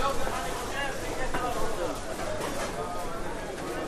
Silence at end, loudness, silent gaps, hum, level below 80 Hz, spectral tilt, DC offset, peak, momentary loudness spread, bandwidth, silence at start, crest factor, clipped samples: 0 s; -33 LUFS; none; none; -38 dBFS; -3.5 dB/octave; under 0.1%; -14 dBFS; 4 LU; 15 kHz; 0 s; 16 dB; under 0.1%